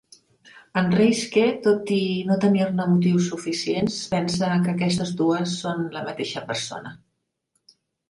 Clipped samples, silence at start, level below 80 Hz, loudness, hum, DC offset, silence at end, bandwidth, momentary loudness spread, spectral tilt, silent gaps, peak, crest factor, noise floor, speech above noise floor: under 0.1%; 0.55 s; -60 dBFS; -23 LUFS; none; under 0.1%; 1.15 s; 11.5 kHz; 9 LU; -5.5 dB/octave; none; -6 dBFS; 16 dB; -76 dBFS; 54 dB